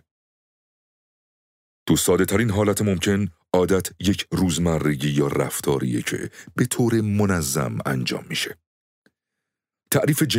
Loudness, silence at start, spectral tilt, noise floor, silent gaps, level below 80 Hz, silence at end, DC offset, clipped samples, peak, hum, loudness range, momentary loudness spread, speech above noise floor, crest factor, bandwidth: -22 LUFS; 1.85 s; -5 dB/octave; -84 dBFS; 8.66-9.02 s; -48 dBFS; 0 s; under 0.1%; under 0.1%; -4 dBFS; none; 3 LU; 6 LU; 63 dB; 18 dB; 16 kHz